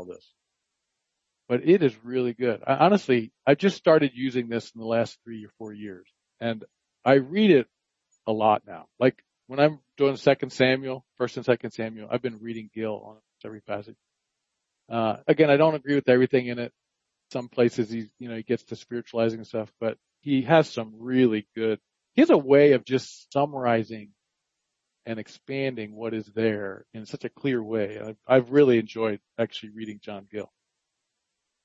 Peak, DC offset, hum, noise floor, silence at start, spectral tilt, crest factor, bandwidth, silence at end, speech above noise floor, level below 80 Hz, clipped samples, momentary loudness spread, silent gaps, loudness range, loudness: -4 dBFS; under 0.1%; none; -82 dBFS; 0 s; -7 dB/octave; 22 dB; 7.8 kHz; 1.2 s; 58 dB; -72 dBFS; under 0.1%; 18 LU; none; 8 LU; -24 LUFS